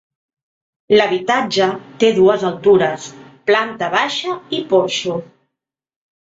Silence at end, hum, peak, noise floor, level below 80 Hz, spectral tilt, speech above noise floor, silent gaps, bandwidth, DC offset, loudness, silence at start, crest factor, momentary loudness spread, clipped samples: 0.95 s; none; -2 dBFS; -82 dBFS; -60 dBFS; -4.5 dB/octave; 66 dB; none; 7.8 kHz; under 0.1%; -16 LUFS; 0.9 s; 16 dB; 10 LU; under 0.1%